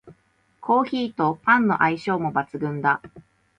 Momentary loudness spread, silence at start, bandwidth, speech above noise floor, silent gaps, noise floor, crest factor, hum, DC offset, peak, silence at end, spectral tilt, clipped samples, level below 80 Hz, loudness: 8 LU; 0.05 s; 9.4 kHz; 41 dB; none; -63 dBFS; 18 dB; none; under 0.1%; -4 dBFS; 0.4 s; -7.5 dB/octave; under 0.1%; -64 dBFS; -22 LUFS